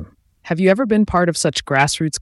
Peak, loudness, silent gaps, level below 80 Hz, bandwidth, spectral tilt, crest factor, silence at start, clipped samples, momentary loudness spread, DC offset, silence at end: -4 dBFS; -17 LUFS; none; -42 dBFS; 12 kHz; -4.5 dB/octave; 14 dB; 0 s; under 0.1%; 3 LU; under 0.1%; 0 s